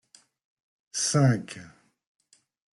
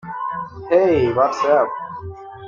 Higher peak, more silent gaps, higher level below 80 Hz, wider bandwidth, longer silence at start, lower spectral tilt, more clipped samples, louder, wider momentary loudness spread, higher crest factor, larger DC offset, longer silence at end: second, -10 dBFS vs -4 dBFS; neither; second, -68 dBFS vs -52 dBFS; first, 12 kHz vs 7.4 kHz; first, 0.95 s vs 0.05 s; second, -4.5 dB/octave vs -7 dB/octave; neither; second, -25 LUFS vs -18 LUFS; first, 20 LU vs 16 LU; about the same, 20 dB vs 16 dB; neither; first, 1.1 s vs 0 s